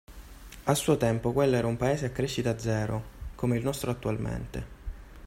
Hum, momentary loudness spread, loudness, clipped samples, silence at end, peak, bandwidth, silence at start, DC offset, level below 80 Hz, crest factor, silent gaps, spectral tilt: none; 18 LU; -29 LUFS; under 0.1%; 0 s; -10 dBFS; 16 kHz; 0.1 s; under 0.1%; -46 dBFS; 20 dB; none; -6 dB/octave